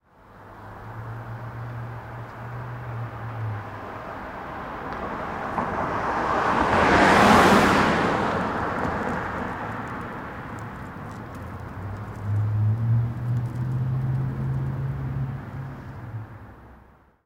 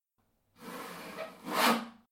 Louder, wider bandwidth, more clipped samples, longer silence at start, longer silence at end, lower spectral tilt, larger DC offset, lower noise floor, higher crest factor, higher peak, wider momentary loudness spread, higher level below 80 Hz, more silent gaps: first, -24 LUFS vs -33 LUFS; about the same, 16 kHz vs 16.5 kHz; neither; second, 0.3 s vs 0.6 s; first, 0.4 s vs 0.2 s; first, -6 dB/octave vs -2.5 dB/octave; neither; second, -53 dBFS vs -77 dBFS; about the same, 20 dB vs 22 dB; first, -6 dBFS vs -14 dBFS; about the same, 19 LU vs 18 LU; first, -44 dBFS vs -78 dBFS; neither